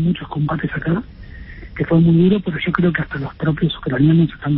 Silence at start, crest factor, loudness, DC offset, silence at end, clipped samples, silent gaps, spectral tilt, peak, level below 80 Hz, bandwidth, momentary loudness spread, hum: 0 s; 16 dB; -18 LUFS; under 0.1%; 0 s; under 0.1%; none; -13 dB/octave; -2 dBFS; -38 dBFS; 4.2 kHz; 19 LU; none